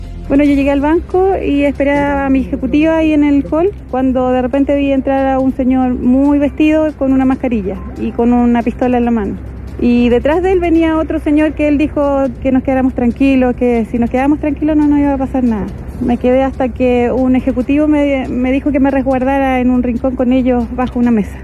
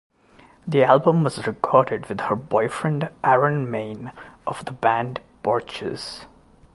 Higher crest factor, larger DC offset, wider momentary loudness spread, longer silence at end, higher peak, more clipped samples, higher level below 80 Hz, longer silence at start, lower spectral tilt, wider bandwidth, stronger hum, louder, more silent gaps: second, 10 dB vs 22 dB; neither; second, 4 LU vs 16 LU; second, 0 s vs 0.5 s; about the same, -2 dBFS vs -2 dBFS; neither; first, -28 dBFS vs -58 dBFS; second, 0 s vs 0.65 s; first, -8 dB/octave vs -6.5 dB/octave; second, 7.6 kHz vs 11.5 kHz; neither; first, -13 LUFS vs -22 LUFS; neither